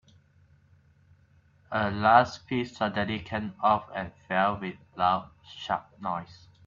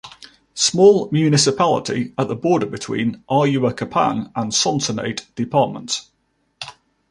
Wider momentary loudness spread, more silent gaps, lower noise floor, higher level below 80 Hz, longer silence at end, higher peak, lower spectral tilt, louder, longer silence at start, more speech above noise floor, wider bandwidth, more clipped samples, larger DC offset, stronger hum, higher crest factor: about the same, 15 LU vs 13 LU; neither; first, -61 dBFS vs -45 dBFS; about the same, -62 dBFS vs -58 dBFS; about the same, 0.35 s vs 0.4 s; second, -6 dBFS vs -2 dBFS; first, -6 dB/octave vs -4.5 dB/octave; second, -28 LUFS vs -18 LUFS; first, 1.7 s vs 0.05 s; first, 34 dB vs 27 dB; second, 7.4 kHz vs 11.5 kHz; neither; neither; neither; first, 24 dB vs 18 dB